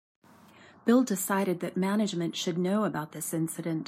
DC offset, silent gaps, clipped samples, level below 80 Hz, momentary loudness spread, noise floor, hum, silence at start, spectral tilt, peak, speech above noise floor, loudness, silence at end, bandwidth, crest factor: under 0.1%; none; under 0.1%; -76 dBFS; 7 LU; -55 dBFS; none; 0.85 s; -5 dB/octave; -12 dBFS; 27 dB; -29 LUFS; 0 s; 16 kHz; 18 dB